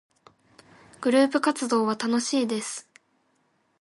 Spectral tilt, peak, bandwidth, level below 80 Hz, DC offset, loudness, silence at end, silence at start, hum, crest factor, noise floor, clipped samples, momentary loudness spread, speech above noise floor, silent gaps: -3.5 dB/octave; -10 dBFS; 11.5 kHz; -76 dBFS; under 0.1%; -25 LUFS; 1 s; 1 s; none; 18 dB; -69 dBFS; under 0.1%; 10 LU; 45 dB; none